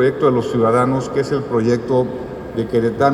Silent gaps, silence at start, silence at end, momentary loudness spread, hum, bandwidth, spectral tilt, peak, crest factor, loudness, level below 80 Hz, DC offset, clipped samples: none; 0 s; 0 s; 9 LU; none; 12.5 kHz; -7.5 dB/octave; 0 dBFS; 16 dB; -18 LUFS; -46 dBFS; under 0.1%; under 0.1%